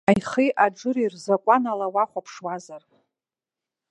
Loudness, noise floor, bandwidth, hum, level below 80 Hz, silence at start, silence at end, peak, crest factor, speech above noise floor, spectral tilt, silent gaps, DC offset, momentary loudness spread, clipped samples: -23 LUFS; -90 dBFS; 11 kHz; none; -62 dBFS; 0.1 s; 1.1 s; -2 dBFS; 22 dB; 67 dB; -6 dB/octave; none; under 0.1%; 13 LU; under 0.1%